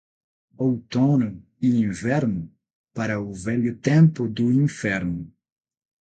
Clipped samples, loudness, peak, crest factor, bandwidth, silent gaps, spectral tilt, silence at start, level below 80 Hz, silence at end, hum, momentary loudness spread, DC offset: under 0.1%; -23 LUFS; -6 dBFS; 18 dB; 9 kHz; 2.75-2.84 s; -7.5 dB/octave; 0.6 s; -54 dBFS; 0.75 s; none; 12 LU; under 0.1%